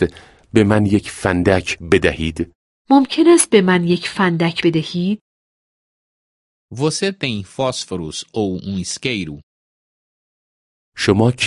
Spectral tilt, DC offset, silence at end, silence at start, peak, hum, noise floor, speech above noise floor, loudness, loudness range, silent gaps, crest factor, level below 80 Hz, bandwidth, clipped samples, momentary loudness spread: -5 dB/octave; under 0.1%; 0 s; 0 s; 0 dBFS; none; under -90 dBFS; over 74 dB; -17 LUFS; 9 LU; 2.55-2.85 s, 5.21-6.68 s, 9.43-10.92 s; 18 dB; -40 dBFS; 11.5 kHz; under 0.1%; 12 LU